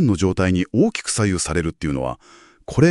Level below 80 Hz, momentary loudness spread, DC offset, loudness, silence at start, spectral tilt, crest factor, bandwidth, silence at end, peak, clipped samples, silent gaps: -42 dBFS; 9 LU; under 0.1%; -20 LUFS; 0 s; -5.5 dB/octave; 18 dB; 11.5 kHz; 0 s; -2 dBFS; under 0.1%; none